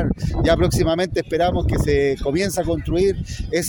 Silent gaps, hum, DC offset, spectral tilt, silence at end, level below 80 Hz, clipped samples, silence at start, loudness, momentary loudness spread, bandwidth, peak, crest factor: none; none; under 0.1%; -6 dB/octave; 0 s; -28 dBFS; under 0.1%; 0 s; -20 LUFS; 5 LU; 19 kHz; -4 dBFS; 16 dB